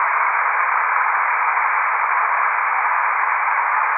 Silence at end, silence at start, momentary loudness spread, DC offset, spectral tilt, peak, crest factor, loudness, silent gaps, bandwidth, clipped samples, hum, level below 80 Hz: 0 s; 0 s; 1 LU; under 0.1%; -3.5 dB/octave; -4 dBFS; 14 dB; -17 LUFS; none; 3.4 kHz; under 0.1%; none; under -90 dBFS